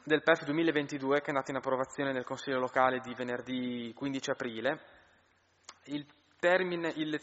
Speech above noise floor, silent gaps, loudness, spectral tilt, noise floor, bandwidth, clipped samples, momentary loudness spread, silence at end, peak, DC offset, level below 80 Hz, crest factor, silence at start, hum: 37 dB; none; -33 LUFS; -3 dB/octave; -69 dBFS; 8 kHz; under 0.1%; 9 LU; 0 s; -10 dBFS; under 0.1%; -74 dBFS; 22 dB; 0.05 s; none